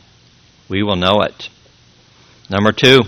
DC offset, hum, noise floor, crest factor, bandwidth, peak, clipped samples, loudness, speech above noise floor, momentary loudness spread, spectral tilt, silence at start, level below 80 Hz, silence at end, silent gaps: under 0.1%; none; -49 dBFS; 16 dB; 15 kHz; 0 dBFS; 0.2%; -15 LUFS; 36 dB; 17 LU; -5 dB/octave; 0.7 s; -48 dBFS; 0 s; none